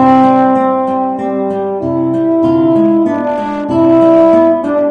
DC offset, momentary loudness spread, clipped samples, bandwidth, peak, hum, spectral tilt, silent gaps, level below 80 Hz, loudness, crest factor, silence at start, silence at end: under 0.1%; 9 LU; under 0.1%; 5.2 kHz; 0 dBFS; none; -9 dB/octave; none; -50 dBFS; -11 LUFS; 10 dB; 0 s; 0 s